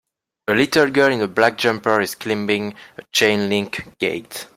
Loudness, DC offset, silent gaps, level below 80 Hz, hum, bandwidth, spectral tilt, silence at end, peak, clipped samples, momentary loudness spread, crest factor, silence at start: -19 LUFS; under 0.1%; none; -60 dBFS; none; 16.5 kHz; -4 dB/octave; 0.1 s; -2 dBFS; under 0.1%; 12 LU; 18 dB; 0.5 s